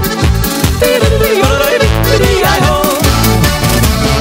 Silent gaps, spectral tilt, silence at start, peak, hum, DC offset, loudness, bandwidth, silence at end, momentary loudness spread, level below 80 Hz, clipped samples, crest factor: none; -4.5 dB/octave; 0 s; 0 dBFS; none; under 0.1%; -10 LUFS; 16.5 kHz; 0 s; 3 LU; -16 dBFS; under 0.1%; 10 dB